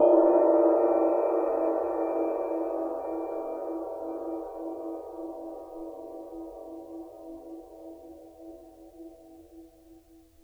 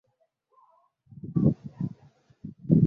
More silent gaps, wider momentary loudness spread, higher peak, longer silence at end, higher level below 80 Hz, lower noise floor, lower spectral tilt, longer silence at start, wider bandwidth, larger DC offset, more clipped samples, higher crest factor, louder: neither; first, 26 LU vs 21 LU; second, -10 dBFS vs -6 dBFS; first, 0.5 s vs 0 s; second, -64 dBFS vs -54 dBFS; second, -56 dBFS vs -73 dBFS; second, -8 dB/octave vs -13.5 dB/octave; second, 0 s vs 1.25 s; first, 3.3 kHz vs 2 kHz; neither; neither; about the same, 18 dB vs 22 dB; about the same, -28 LUFS vs -28 LUFS